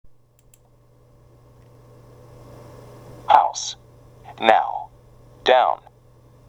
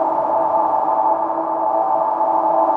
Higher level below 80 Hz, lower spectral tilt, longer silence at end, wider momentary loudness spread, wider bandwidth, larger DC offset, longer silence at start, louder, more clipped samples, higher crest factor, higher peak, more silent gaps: first, -56 dBFS vs -64 dBFS; second, -2.5 dB/octave vs -8 dB/octave; first, 0.7 s vs 0 s; first, 27 LU vs 3 LU; first, 11.5 kHz vs 3.9 kHz; neither; first, 3.1 s vs 0 s; about the same, -19 LUFS vs -18 LUFS; neither; first, 24 dB vs 12 dB; first, 0 dBFS vs -6 dBFS; neither